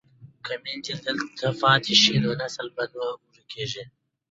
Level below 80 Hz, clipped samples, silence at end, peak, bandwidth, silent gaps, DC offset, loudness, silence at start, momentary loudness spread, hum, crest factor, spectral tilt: -62 dBFS; under 0.1%; 0.45 s; -4 dBFS; 8 kHz; none; under 0.1%; -24 LUFS; 0.2 s; 18 LU; none; 22 dB; -3.5 dB/octave